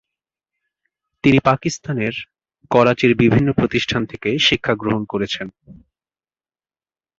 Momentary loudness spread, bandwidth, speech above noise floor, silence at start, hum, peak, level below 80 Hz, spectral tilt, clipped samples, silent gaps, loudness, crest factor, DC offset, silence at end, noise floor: 10 LU; 7.8 kHz; over 73 dB; 1.25 s; none; -2 dBFS; -46 dBFS; -5.5 dB/octave; under 0.1%; none; -18 LUFS; 18 dB; under 0.1%; 1.45 s; under -90 dBFS